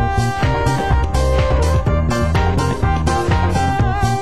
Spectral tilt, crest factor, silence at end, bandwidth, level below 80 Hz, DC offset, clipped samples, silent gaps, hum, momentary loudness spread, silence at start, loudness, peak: -6.5 dB/octave; 12 dB; 0 s; 12.5 kHz; -20 dBFS; 3%; under 0.1%; none; none; 2 LU; 0 s; -17 LUFS; -2 dBFS